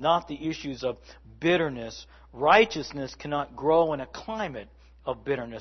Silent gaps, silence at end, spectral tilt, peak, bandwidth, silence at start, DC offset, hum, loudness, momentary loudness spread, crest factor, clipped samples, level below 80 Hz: none; 0 s; -5 dB/octave; -4 dBFS; 6.4 kHz; 0 s; under 0.1%; none; -27 LUFS; 17 LU; 24 dB; under 0.1%; -54 dBFS